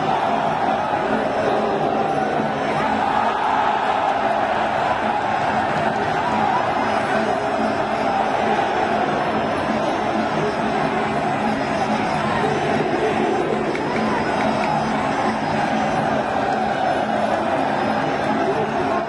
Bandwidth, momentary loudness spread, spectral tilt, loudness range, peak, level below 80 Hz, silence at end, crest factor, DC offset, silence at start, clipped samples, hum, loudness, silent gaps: 11.5 kHz; 2 LU; -5.5 dB/octave; 1 LU; -6 dBFS; -50 dBFS; 0 s; 14 dB; under 0.1%; 0 s; under 0.1%; none; -20 LUFS; none